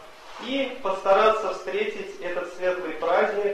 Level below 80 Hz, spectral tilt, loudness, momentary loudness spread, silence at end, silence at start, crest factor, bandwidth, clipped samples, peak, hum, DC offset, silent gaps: -62 dBFS; -4 dB/octave; -25 LUFS; 12 LU; 0 s; 0 s; 16 dB; 13 kHz; under 0.1%; -8 dBFS; none; under 0.1%; none